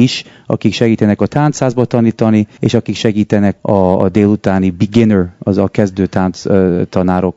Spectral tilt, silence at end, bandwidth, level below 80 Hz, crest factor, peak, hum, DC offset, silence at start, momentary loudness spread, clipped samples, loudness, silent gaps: -7 dB/octave; 0.05 s; 7.8 kHz; -44 dBFS; 12 dB; 0 dBFS; none; under 0.1%; 0 s; 4 LU; 0.7%; -13 LUFS; none